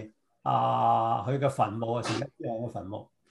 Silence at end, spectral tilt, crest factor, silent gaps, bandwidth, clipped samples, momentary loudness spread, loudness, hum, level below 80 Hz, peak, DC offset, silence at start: 0.25 s; -6.5 dB/octave; 16 dB; none; 12 kHz; under 0.1%; 15 LU; -29 LUFS; none; -70 dBFS; -12 dBFS; under 0.1%; 0 s